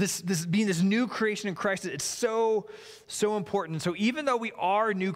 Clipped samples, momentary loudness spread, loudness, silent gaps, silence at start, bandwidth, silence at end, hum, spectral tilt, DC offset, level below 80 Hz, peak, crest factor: under 0.1%; 6 LU; -28 LUFS; none; 0 s; 16 kHz; 0 s; none; -4.5 dB/octave; under 0.1%; -70 dBFS; -14 dBFS; 14 dB